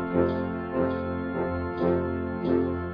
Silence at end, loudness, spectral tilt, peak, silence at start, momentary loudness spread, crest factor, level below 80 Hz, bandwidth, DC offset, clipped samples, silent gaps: 0 s; -28 LUFS; -11 dB/octave; -10 dBFS; 0 s; 4 LU; 18 dB; -46 dBFS; 5.2 kHz; under 0.1%; under 0.1%; none